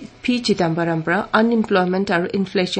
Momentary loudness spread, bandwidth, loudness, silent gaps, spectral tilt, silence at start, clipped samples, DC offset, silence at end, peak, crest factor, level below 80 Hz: 4 LU; 8.8 kHz; -19 LUFS; none; -6 dB/octave; 0 s; under 0.1%; under 0.1%; 0 s; -2 dBFS; 16 dB; -54 dBFS